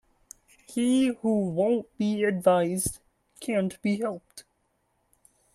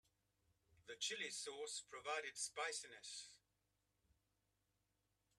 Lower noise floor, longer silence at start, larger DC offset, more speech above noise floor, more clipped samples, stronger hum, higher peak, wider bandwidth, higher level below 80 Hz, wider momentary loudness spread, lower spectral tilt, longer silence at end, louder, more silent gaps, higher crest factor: second, -73 dBFS vs -87 dBFS; about the same, 0.7 s vs 0.8 s; neither; first, 47 dB vs 38 dB; neither; neither; first, -8 dBFS vs -32 dBFS; about the same, 13.5 kHz vs 13 kHz; first, -60 dBFS vs -90 dBFS; about the same, 11 LU vs 12 LU; first, -5.5 dB/octave vs 1 dB/octave; second, 1.15 s vs 2 s; first, -26 LUFS vs -47 LUFS; neither; about the same, 20 dB vs 22 dB